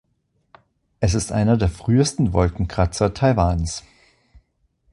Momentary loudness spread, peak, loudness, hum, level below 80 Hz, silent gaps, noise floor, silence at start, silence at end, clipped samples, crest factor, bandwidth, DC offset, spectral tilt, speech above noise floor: 6 LU; -2 dBFS; -20 LUFS; none; -32 dBFS; none; -68 dBFS; 1 s; 1.15 s; under 0.1%; 18 dB; 11.5 kHz; under 0.1%; -6 dB/octave; 49 dB